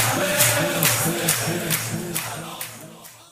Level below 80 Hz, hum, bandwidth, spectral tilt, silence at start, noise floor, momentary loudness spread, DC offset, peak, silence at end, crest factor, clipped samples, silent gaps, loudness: -54 dBFS; none; 16 kHz; -2.5 dB/octave; 0 s; -43 dBFS; 16 LU; under 0.1%; -2 dBFS; 0.1 s; 22 dB; under 0.1%; none; -20 LUFS